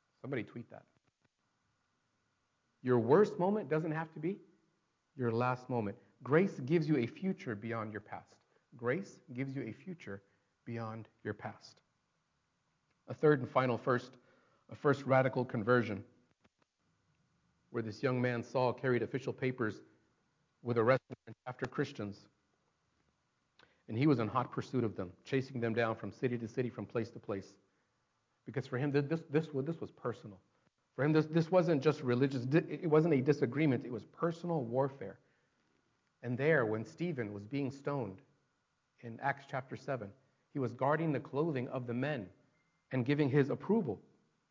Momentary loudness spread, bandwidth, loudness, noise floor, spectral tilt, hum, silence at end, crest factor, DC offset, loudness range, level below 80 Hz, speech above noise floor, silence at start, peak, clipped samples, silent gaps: 16 LU; 7.6 kHz; -35 LUFS; -81 dBFS; -8 dB/octave; none; 0.5 s; 22 dB; under 0.1%; 8 LU; -74 dBFS; 46 dB; 0.25 s; -14 dBFS; under 0.1%; none